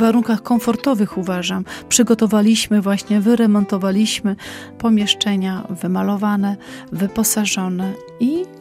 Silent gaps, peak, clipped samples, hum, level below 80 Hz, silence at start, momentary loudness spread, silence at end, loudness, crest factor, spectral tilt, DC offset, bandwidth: none; 0 dBFS; under 0.1%; none; -52 dBFS; 0 s; 9 LU; 0 s; -17 LUFS; 18 dB; -4.5 dB/octave; under 0.1%; 16 kHz